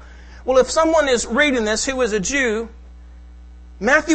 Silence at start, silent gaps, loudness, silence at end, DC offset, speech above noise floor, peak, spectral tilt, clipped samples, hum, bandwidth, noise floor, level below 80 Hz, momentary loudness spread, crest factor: 0 s; none; -18 LUFS; 0 s; under 0.1%; 23 dB; 0 dBFS; -3 dB/octave; under 0.1%; none; 8.8 kHz; -40 dBFS; -40 dBFS; 9 LU; 20 dB